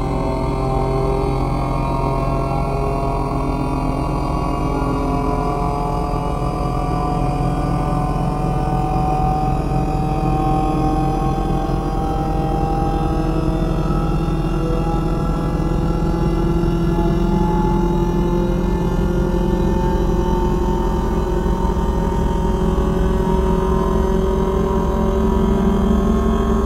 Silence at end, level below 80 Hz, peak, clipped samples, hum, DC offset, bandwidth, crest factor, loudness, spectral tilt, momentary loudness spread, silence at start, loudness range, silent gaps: 0 s; -22 dBFS; -4 dBFS; under 0.1%; none; 0.3%; 13 kHz; 14 dB; -19 LUFS; -8 dB/octave; 3 LU; 0 s; 2 LU; none